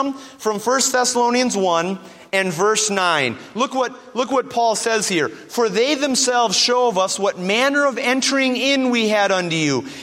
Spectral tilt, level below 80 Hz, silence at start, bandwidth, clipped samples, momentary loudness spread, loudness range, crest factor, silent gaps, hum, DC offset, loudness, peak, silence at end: -2.5 dB/octave; -68 dBFS; 0 s; 16 kHz; under 0.1%; 7 LU; 3 LU; 16 dB; none; none; under 0.1%; -18 LUFS; -2 dBFS; 0 s